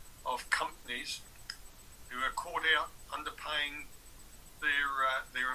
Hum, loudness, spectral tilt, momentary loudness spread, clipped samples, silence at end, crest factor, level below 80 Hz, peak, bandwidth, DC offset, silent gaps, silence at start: none; -34 LUFS; -1 dB/octave; 24 LU; under 0.1%; 0 s; 22 dB; -58 dBFS; -14 dBFS; 16 kHz; under 0.1%; none; 0 s